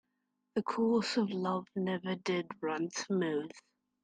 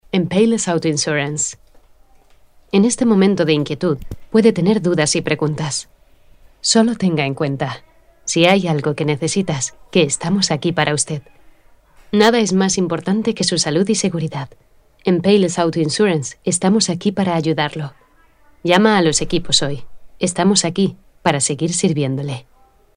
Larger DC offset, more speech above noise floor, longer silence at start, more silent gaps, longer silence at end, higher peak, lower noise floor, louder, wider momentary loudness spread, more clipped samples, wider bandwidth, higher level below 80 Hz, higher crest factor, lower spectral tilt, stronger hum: neither; first, 49 dB vs 34 dB; first, 0.55 s vs 0.15 s; neither; about the same, 0.45 s vs 0.55 s; second, -18 dBFS vs 0 dBFS; first, -83 dBFS vs -51 dBFS; second, -34 LUFS vs -17 LUFS; about the same, 7 LU vs 9 LU; neither; about the same, 9.6 kHz vs 10.5 kHz; second, -80 dBFS vs -48 dBFS; about the same, 16 dB vs 18 dB; about the same, -5 dB/octave vs -4.5 dB/octave; neither